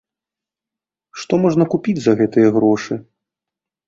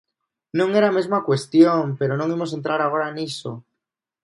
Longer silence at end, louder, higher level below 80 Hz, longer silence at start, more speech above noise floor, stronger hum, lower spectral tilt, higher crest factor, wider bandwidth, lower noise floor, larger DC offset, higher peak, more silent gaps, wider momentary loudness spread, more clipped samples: first, 0.85 s vs 0.65 s; first, -16 LUFS vs -20 LUFS; first, -58 dBFS vs -68 dBFS; first, 1.15 s vs 0.55 s; first, 72 dB vs 63 dB; neither; about the same, -7 dB/octave vs -6.5 dB/octave; about the same, 18 dB vs 18 dB; second, 7.6 kHz vs 11.5 kHz; first, -87 dBFS vs -83 dBFS; neither; about the same, -2 dBFS vs -2 dBFS; neither; about the same, 14 LU vs 13 LU; neither